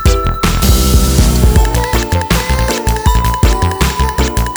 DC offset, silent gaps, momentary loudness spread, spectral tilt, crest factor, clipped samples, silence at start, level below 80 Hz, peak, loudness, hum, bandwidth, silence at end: under 0.1%; none; 4 LU; -4.5 dB/octave; 10 dB; under 0.1%; 0 s; -14 dBFS; 0 dBFS; -12 LUFS; none; over 20 kHz; 0 s